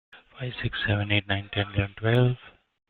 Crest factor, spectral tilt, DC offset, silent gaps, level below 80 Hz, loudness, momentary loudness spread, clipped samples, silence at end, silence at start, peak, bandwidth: 18 dB; -8.5 dB/octave; under 0.1%; none; -48 dBFS; -26 LUFS; 12 LU; under 0.1%; 0.4 s; 0.15 s; -10 dBFS; 4.4 kHz